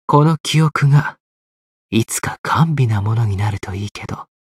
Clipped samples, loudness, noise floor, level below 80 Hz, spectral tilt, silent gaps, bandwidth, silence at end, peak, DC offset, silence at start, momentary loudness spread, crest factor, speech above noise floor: under 0.1%; -17 LUFS; under -90 dBFS; -48 dBFS; -6 dB/octave; 0.40-0.44 s, 1.20-1.89 s, 2.39-2.44 s, 3.91-3.95 s; 15 kHz; 0.2 s; -2 dBFS; under 0.1%; 0.1 s; 13 LU; 16 dB; over 74 dB